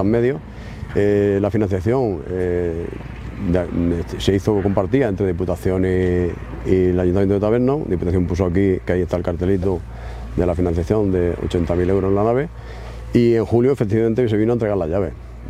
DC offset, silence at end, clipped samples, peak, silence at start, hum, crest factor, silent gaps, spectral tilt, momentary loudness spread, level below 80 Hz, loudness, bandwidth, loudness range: under 0.1%; 0 s; under 0.1%; 0 dBFS; 0 s; none; 18 dB; none; -8.5 dB/octave; 10 LU; -34 dBFS; -19 LUFS; 13.5 kHz; 2 LU